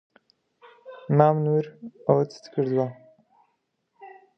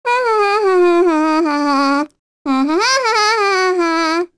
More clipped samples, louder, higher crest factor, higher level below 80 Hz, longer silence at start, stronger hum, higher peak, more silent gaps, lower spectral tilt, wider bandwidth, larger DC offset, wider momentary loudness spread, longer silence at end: neither; second, -24 LUFS vs -14 LUFS; first, 24 dB vs 12 dB; second, -70 dBFS vs -58 dBFS; first, 0.85 s vs 0.05 s; neither; about the same, -2 dBFS vs -2 dBFS; second, none vs 2.19-2.45 s; first, -9.5 dB/octave vs -1.5 dB/octave; second, 6.4 kHz vs 11 kHz; second, under 0.1% vs 0.4%; first, 17 LU vs 6 LU; first, 0.3 s vs 0.1 s